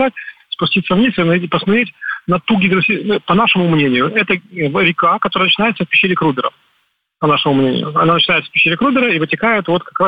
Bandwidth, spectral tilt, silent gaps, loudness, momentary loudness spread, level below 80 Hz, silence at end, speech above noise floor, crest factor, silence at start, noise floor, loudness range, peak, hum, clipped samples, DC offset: 5 kHz; -8 dB/octave; none; -14 LUFS; 7 LU; -50 dBFS; 0 s; 49 dB; 12 dB; 0 s; -63 dBFS; 1 LU; -2 dBFS; none; under 0.1%; under 0.1%